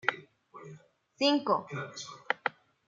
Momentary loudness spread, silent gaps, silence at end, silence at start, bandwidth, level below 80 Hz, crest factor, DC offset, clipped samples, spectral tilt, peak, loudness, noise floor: 22 LU; none; 0.35 s; 0.05 s; 7.6 kHz; -80 dBFS; 26 dB; under 0.1%; under 0.1%; -4 dB/octave; -8 dBFS; -31 LUFS; -55 dBFS